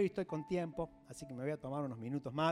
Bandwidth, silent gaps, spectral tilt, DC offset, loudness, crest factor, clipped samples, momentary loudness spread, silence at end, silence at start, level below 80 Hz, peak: 15 kHz; none; -6.5 dB/octave; under 0.1%; -41 LUFS; 16 dB; under 0.1%; 9 LU; 0 s; 0 s; -66 dBFS; -22 dBFS